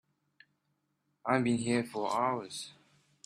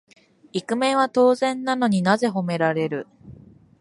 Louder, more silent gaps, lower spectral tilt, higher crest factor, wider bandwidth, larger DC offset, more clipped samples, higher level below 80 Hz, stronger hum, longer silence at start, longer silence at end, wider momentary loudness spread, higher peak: second, -33 LUFS vs -22 LUFS; neither; about the same, -5 dB/octave vs -5.5 dB/octave; about the same, 22 dB vs 18 dB; first, 13 kHz vs 11.5 kHz; neither; neither; second, -74 dBFS vs -64 dBFS; neither; first, 1.25 s vs 0.55 s; about the same, 0.55 s vs 0.5 s; about the same, 13 LU vs 13 LU; second, -12 dBFS vs -4 dBFS